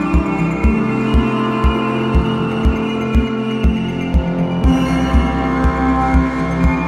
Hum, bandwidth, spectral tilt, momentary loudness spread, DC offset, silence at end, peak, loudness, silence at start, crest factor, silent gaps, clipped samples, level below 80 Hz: none; 9.4 kHz; -7.5 dB/octave; 3 LU; under 0.1%; 0 s; -2 dBFS; -16 LUFS; 0 s; 14 dB; none; under 0.1%; -20 dBFS